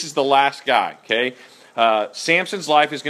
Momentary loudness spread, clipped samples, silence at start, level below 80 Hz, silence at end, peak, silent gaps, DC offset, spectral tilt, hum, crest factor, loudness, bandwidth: 5 LU; under 0.1%; 0 s; -74 dBFS; 0 s; 0 dBFS; none; under 0.1%; -3 dB/octave; none; 18 dB; -18 LUFS; 14.5 kHz